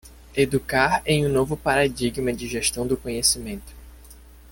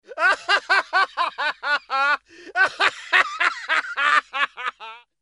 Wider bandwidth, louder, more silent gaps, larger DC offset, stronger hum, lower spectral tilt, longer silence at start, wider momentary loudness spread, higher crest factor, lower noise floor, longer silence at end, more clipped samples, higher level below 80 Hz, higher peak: first, 17 kHz vs 11.5 kHz; about the same, -22 LUFS vs -21 LUFS; neither; neither; neither; first, -3.5 dB/octave vs 0.5 dB/octave; about the same, 0.05 s vs 0.1 s; about the same, 7 LU vs 8 LU; about the same, 20 dB vs 22 dB; first, -46 dBFS vs -42 dBFS; second, 0.1 s vs 0.25 s; neither; first, -42 dBFS vs -72 dBFS; about the same, -4 dBFS vs -2 dBFS